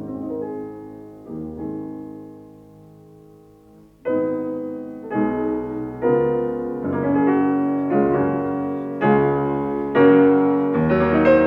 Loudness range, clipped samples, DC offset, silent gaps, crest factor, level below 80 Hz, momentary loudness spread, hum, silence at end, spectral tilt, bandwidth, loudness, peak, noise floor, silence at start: 15 LU; under 0.1%; under 0.1%; none; 16 dB; -50 dBFS; 18 LU; none; 0 s; -10 dB/octave; 5.2 kHz; -20 LUFS; -4 dBFS; -49 dBFS; 0 s